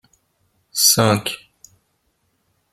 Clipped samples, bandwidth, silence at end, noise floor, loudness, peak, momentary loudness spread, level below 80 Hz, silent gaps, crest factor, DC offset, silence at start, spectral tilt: under 0.1%; 16.5 kHz; 1.35 s; -68 dBFS; -16 LUFS; 0 dBFS; 16 LU; -58 dBFS; none; 22 dB; under 0.1%; 0.75 s; -2.5 dB/octave